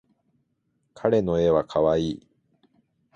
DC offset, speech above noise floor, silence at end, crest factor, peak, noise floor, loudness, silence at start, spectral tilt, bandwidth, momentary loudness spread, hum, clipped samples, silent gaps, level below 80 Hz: under 0.1%; 51 dB; 1 s; 18 dB; -8 dBFS; -73 dBFS; -23 LUFS; 1 s; -7.5 dB/octave; 8.2 kHz; 9 LU; none; under 0.1%; none; -50 dBFS